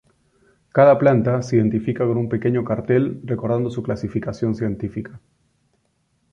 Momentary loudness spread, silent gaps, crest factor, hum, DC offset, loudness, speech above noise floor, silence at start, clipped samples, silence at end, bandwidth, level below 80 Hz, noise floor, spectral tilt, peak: 11 LU; none; 18 dB; none; under 0.1%; -20 LUFS; 48 dB; 0.75 s; under 0.1%; 1.15 s; 7.6 kHz; -50 dBFS; -67 dBFS; -9 dB/octave; -2 dBFS